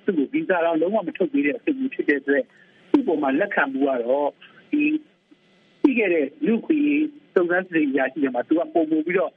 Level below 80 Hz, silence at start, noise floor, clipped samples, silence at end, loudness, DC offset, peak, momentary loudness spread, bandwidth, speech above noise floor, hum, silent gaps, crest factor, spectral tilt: -70 dBFS; 0.05 s; -58 dBFS; under 0.1%; 0.05 s; -22 LUFS; under 0.1%; -6 dBFS; 4 LU; 3.9 kHz; 36 dB; none; none; 16 dB; -8.5 dB/octave